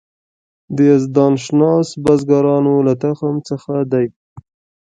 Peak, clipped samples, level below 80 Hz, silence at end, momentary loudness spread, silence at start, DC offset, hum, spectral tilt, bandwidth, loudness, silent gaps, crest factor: 0 dBFS; under 0.1%; -54 dBFS; 0.45 s; 8 LU; 0.7 s; under 0.1%; none; -8 dB/octave; 9.2 kHz; -15 LUFS; 4.16-4.36 s; 14 dB